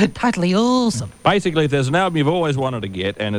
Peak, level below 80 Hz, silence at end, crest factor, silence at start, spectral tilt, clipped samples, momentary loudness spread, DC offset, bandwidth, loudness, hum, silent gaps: -2 dBFS; -48 dBFS; 0 s; 16 dB; 0 s; -5.5 dB/octave; under 0.1%; 6 LU; under 0.1%; 13 kHz; -18 LUFS; none; none